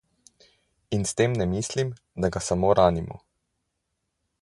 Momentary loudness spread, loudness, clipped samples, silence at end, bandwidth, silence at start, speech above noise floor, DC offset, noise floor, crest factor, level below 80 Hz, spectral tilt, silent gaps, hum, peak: 12 LU; -25 LUFS; under 0.1%; 1.25 s; 11.5 kHz; 0.9 s; 55 dB; under 0.1%; -79 dBFS; 22 dB; -46 dBFS; -5.5 dB/octave; none; none; -4 dBFS